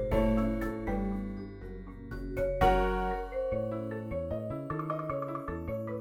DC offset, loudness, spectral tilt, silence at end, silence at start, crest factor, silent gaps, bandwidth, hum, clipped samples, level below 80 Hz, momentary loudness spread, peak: under 0.1%; -33 LUFS; -8 dB/octave; 0 s; 0 s; 18 dB; none; 16.5 kHz; none; under 0.1%; -40 dBFS; 14 LU; -14 dBFS